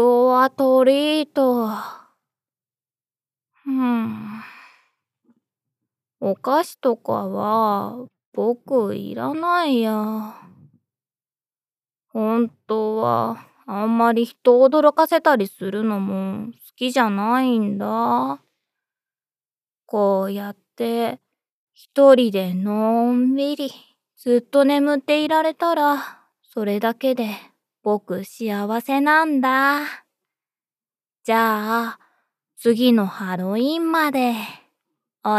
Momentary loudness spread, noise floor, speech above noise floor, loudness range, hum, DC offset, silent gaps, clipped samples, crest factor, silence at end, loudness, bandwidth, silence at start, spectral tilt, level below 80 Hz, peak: 14 LU; under -90 dBFS; over 71 dB; 8 LU; none; under 0.1%; 8.26-8.32 s, 21.51-21.67 s; under 0.1%; 20 dB; 0 s; -20 LUFS; 15.5 kHz; 0 s; -6 dB/octave; under -90 dBFS; -2 dBFS